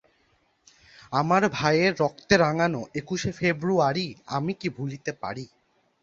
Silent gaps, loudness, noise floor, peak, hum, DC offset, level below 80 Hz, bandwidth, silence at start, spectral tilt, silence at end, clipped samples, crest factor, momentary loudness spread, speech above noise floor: none; -25 LUFS; -67 dBFS; -6 dBFS; none; under 0.1%; -58 dBFS; 7.8 kHz; 1.1 s; -5.5 dB/octave; 0.55 s; under 0.1%; 22 dB; 11 LU; 42 dB